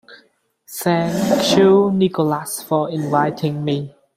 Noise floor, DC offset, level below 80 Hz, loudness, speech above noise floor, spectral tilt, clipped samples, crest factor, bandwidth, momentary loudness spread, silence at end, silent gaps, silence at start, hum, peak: -57 dBFS; under 0.1%; -58 dBFS; -18 LUFS; 40 dB; -5.5 dB/octave; under 0.1%; 16 dB; 16 kHz; 11 LU; 0.3 s; none; 0.1 s; none; -2 dBFS